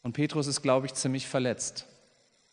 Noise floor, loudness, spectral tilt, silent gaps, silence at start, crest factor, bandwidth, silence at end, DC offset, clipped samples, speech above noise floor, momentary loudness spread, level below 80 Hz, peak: -66 dBFS; -29 LUFS; -4.5 dB/octave; none; 0.05 s; 20 dB; 10 kHz; 0.7 s; under 0.1%; under 0.1%; 36 dB; 8 LU; -72 dBFS; -10 dBFS